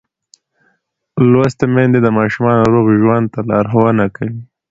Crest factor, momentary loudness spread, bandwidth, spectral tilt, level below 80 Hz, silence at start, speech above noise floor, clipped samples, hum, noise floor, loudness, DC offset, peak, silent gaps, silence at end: 14 dB; 10 LU; 7.8 kHz; -9 dB/octave; -46 dBFS; 1.15 s; 51 dB; under 0.1%; none; -63 dBFS; -13 LUFS; under 0.1%; 0 dBFS; none; 0.25 s